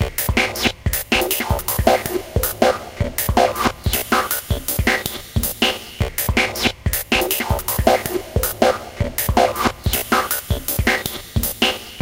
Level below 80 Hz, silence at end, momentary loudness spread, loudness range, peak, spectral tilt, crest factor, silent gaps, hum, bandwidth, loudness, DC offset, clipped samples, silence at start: -30 dBFS; 0 s; 5 LU; 1 LU; 0 dBFS; -3.5 dB/octave; 20 dB; none; none; 17 kHz; -19 LUFS; 0.1%; under 0.1%; 0 s